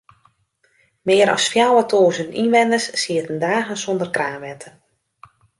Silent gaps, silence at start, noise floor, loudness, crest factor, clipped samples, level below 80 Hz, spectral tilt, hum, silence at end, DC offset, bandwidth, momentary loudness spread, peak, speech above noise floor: none; 1.05 s; -63 dBFS; -18 LUFS; 18 dB; under 0.1%; -66 dBFS; -3.5 dB/octave; none; 0.9 s; under 0.1%; 11.5 kHz; 12 LU; -2 dBFS; 45 dB